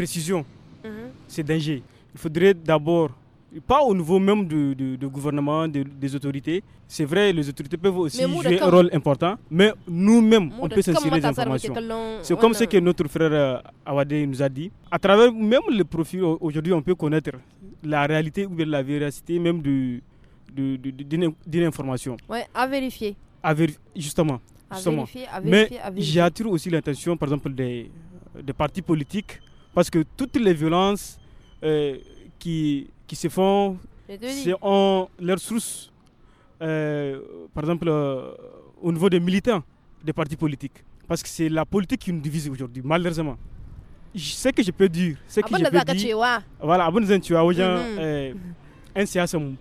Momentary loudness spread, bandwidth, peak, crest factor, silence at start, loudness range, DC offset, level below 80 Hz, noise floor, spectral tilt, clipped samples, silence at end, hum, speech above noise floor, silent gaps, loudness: 13 LU; 15.5 kHz; -2 dBFS; 20 dB; 0 s; 6 LU; under 0.1%; -48 dBFS; -54 dBFS; -6 dB/octave; under 0.1%; 0 s; none; 32 dB; none; -23 LUFS